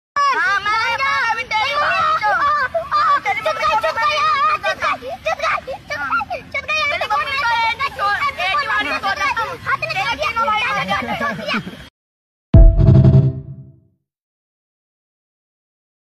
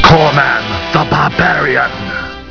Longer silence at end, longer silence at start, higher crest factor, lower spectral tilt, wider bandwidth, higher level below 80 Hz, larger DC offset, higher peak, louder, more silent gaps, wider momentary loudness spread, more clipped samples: first, 2.45 s vs 0 s; first, 0.15 s vs 0 s; first, 18 dB vs 12 dB; about the same, -5.5 dB/octave vs -5.5 dB/octave; first, 13.5 kHz vs 5.4 kHz; about the same, -26 dBFS vs -30 dBFS; neither; about the same, 0 dBFS vs 0 dBFS; second, -17 LUFS vs -12 LUFS; first, 11.90-12.53 s vs none; second, 9 LU vs 12 LU; second, under 0.1% vs 0.7%